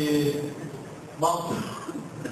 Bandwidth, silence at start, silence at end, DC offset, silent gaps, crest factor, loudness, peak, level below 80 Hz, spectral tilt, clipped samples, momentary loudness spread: 14 kHz; 0 s; 0 s; under 0.1%; none; 18 dB; -29 LUFS; -10 dBFS; -60 dBFS; -5.5 dB/octave; under 0.1%; 13 LU